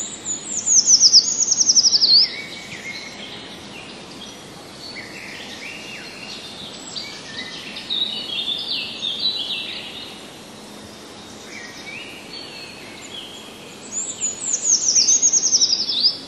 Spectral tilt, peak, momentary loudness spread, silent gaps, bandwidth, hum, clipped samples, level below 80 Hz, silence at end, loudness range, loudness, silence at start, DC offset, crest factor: 1.5 dB/octave; 0 dBFS; 24 LU; none; 13.5 kHz; none; under 0.1%; -62 dBFS; 0 s; 20 LU; -15 LUFS; 0 s; under 0.1%; 22 dB